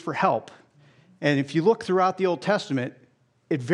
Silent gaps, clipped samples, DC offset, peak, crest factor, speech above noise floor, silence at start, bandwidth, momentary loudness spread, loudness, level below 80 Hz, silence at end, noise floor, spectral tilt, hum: none; under 0.1%; under 0.1%; -6 dBFS; 18 dB; 33 dB; 0.05 s; 11 kHz; 8 LU; -24 LUFS; -74 dBFS; 0 s; -56 dBFS; -6.5 dB/octave; none